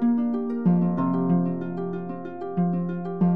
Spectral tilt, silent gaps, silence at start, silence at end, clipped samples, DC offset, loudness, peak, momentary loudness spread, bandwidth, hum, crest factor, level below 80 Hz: -12.5 dB/octave; none; 0 s; 0 s; under 0.1%; 0.6%; -25 LUFS; -12 dBFS; 9 LU; 3.3 kHz; none; 14 dB; -68 dBFS